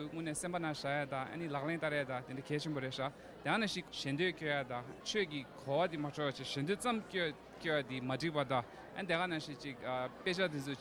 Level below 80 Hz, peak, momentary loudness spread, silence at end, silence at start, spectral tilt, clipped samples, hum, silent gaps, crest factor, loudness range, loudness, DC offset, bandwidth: -70 dBFS; -20 dBFS; 7 LU; 0 s; 0 s; -4.5 dB/octave; under 0.1%; none; none; 20 dB; 1 LU; -38 LUFS; under 0.1%; 19.5 kHz